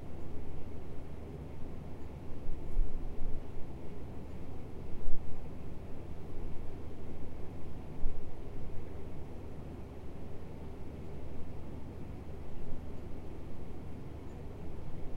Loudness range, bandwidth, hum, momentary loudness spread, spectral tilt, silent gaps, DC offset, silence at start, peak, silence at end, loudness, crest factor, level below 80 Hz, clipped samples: 2 LU; 3.4 kHz; none; 3 LU; -8 dB/octave; none; under 0.1%; 0 s; -12 dBFS; 0 s; -47 LUFS; 18 dB; -40 dBFS; under 0.1%